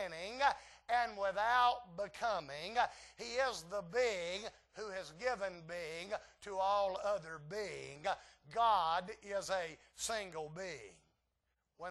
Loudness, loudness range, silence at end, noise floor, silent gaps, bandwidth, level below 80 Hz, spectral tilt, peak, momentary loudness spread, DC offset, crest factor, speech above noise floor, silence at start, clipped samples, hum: -38 LUFS; 4 LU; 0 s; -85 dBFS; none; 12 kHz; -70 dBFS; -2.5 dB/octave; -18 dBFS; 13 LU; under 0.1%; 20 dB; 46 dB; 0 s; under 0.1%; none